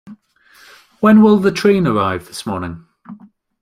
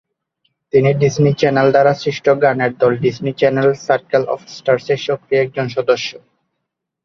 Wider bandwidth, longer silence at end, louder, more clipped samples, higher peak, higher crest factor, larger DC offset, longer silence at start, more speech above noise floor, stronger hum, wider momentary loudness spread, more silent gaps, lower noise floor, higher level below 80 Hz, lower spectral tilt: first, 14 kHz vs 7.2 kHz; second, 0.45 s vs 0.85 s; about the same, -14 LUFS vs -16 LUFS; neither; about the same, -2 dBFS vs 0 dBFS; about the same, 14 dB vs 14 dB; neither; second, 0.05 s vs 0.75 s; second, 36 dB vs 62 dB; neither; first, 16 LU vs 6 LU; neither; second, -50 dBFS vs -77 dBFS; about the same, -52 dBFS vs -54 dBFS; about the same, -7 dB/octave vs -6.5 dB/octave